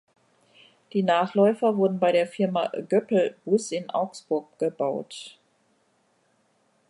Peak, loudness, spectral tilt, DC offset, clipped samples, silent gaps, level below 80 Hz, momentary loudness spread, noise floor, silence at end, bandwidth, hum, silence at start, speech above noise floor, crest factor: -8 dBFS; -25 LUFS; -6 dB/octave; under 0.1%; under 0.1%; none; -80 dBFS; 9 LU; -67 dBFS; 1.6 s; 11.5 kHz; none; 0.95 s; 43 dB; 18 dB